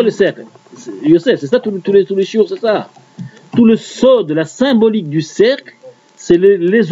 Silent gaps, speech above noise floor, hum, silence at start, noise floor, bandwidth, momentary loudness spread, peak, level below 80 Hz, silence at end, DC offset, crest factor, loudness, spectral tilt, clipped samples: none; 20 dB; none; 0 s; -32 dBFS; 8 kHz; 22 LU; 0 dBFS; -54 dBFS; 0 s; under 0.1%; 12 dB; -13 LUFS; -6 dB/octave; under 0.1%